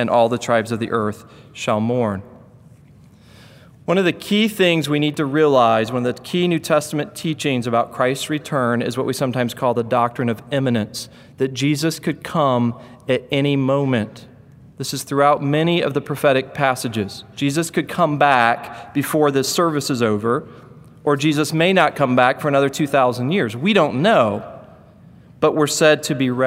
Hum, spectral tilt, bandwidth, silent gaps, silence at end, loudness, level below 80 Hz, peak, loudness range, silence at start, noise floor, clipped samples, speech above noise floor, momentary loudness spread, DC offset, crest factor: none; -5 dB/octave; 16 kHz; none; 0 s; -19 LUFS; -60 dBFS; 0 dBFS; 4 LU; 0 s; -47 dBFS; under 0.1%; 29 dB; 10 LU; under 0.1%; 18 dB